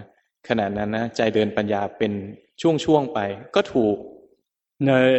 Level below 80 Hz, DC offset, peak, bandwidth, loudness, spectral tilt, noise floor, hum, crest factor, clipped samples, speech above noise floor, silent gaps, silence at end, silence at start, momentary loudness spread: -56 dBFS; under 0.1%; -4 dBFS; 8.4 kHz; -23 LUFS; -6.5 dB/octave; -67 dBFS; none; 18 dB; under 0.1%; 46 dB; none; 0 s; 0 s; 6 LU